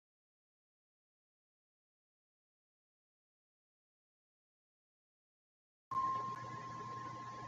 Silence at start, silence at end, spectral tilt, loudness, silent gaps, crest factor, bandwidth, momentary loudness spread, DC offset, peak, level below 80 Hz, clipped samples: 5.9 s; 0 s; -5 dB/octave; -43 LUFS; none; 20 dB; 7.8 kHz; 9 LU; under 0.1%; -30 dBFS; -82 dBFS; under 0.1%